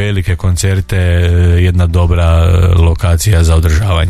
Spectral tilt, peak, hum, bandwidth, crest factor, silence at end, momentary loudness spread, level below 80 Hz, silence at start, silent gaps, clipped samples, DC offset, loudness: -6 dB/octave; 0 dBFS; none; 14 kHz; 8 dB; 0 s; 4 LU; -20 dBFS; 0 s; none; under 0.1%; under 0.1%; -11 LUFS